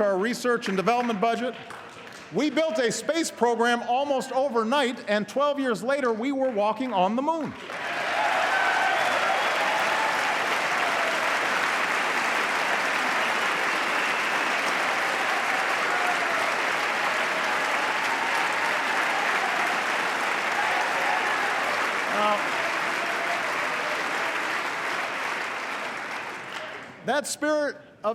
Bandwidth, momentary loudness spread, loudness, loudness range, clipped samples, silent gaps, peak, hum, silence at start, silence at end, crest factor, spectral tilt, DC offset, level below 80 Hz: 16 kHz; 6 LU; -25 LUFS; 3 LU; under 0.1%; none; -8 dBFS; none; 0 s; 0 s; 18 dB; -2.5 dB/octave; under 0.1%; -76 dBFS